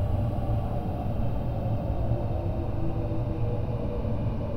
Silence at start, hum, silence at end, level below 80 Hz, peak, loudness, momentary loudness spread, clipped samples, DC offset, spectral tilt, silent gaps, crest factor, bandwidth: 0 s; none; 0 s; -34 dBFS; -14 dBFS; -30 LUFS; 2 LU; under 0.1%; under 0.1%; -10 dB/octave; none; 12 dB; 5.4 kHz